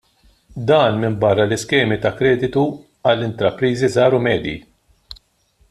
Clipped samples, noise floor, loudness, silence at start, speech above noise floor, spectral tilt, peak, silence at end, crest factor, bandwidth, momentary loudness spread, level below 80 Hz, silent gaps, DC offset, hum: under 0.1%; -59 dBFS; -17 LUFS; 0.55 s; 42 dB; -6 dB/octave; -2 dBFS; 0.55 s; 16 dB; 12.5 kHz; 8 LU; -48 dBFS; none; under 0.1%; none